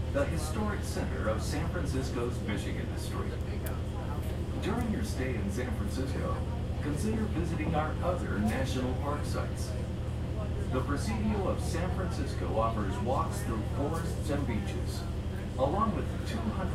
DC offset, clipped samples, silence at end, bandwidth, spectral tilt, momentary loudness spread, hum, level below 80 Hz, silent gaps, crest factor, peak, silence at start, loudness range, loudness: under 0.1%; under 0.1%; 0 s; 15 kHz; -6.5 dB/octave; 5 LU; none; -38 dBFS; none; 16 dB; -16 dBFS; 0 s; 2 LU; -33 LUFS